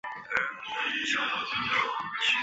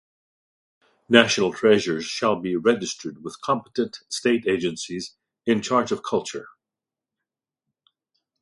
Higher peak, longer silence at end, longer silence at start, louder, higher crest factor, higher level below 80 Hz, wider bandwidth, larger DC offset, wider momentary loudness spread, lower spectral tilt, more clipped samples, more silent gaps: second, -8 dBFS vs 0 dBFS; second, 0 s vs 1.95 s; second, 0.05 s vs 1.1 s; second, -29 LUFS vs -23 LUFS; about the same, 22 dB vs 24 dB; about the same, -68 dBFS vs -64 dBFS; second, 8.4 kHz vs 11.5 kHz; neither; second, 5 LU vs 15 LU; second, -1.5 dB/octave vs -4 dB/octave; neither; neither